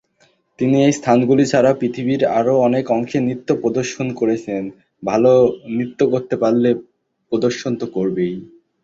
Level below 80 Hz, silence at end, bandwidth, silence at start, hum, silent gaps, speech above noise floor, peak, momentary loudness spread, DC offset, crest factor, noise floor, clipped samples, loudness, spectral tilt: -56 dBFS; 0.4 s; 8 kHz; 0.6 s; none; none; 42 dB; -2 dBFS; 10 LU; under 0.1%; 16 dB; -59 dBFS; under 0.1%; -17 LUFS; -6.5 dB/octave